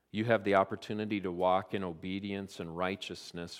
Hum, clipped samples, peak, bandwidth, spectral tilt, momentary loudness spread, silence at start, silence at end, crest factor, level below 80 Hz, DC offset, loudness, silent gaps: none; under 0.1%; -12 dBFS; 14.5 kHz; -6 dB/octave; 11 LU; 0.15 s; 0 s; 22 dB; -70 dBFS; under 0.1%; -33 LUFS; none